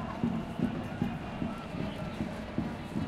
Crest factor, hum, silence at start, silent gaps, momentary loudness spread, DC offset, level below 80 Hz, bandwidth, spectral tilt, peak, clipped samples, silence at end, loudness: 18 dB; none; 0 s; none; 4 LU; under 0.1%; -50 dBFS; 13.5 kHz; -7.5 dB/octave; -18 dBFS; under 0.1%; 0 s; -36 LUFS